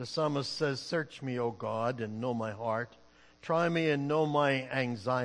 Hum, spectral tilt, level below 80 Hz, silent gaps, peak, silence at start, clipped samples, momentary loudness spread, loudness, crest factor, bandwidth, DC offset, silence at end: none; -6 dB/octave; -72 dBFS; none; -14 dBFS; 0 s; under 0.1%; 7 LU; -32 LUFS; 18 dB; 10.5 kHz; under 0.1%; 0 s